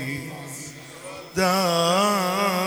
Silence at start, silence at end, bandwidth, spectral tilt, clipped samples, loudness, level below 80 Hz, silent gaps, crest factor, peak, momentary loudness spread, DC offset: 0 s; 0 s; over 20 kHz; -4 dB/octave; under 0.1%; -22 LUFS; -58 dBFS; none; 16 dB; -8 dBFS; 18 LU; under 0.1%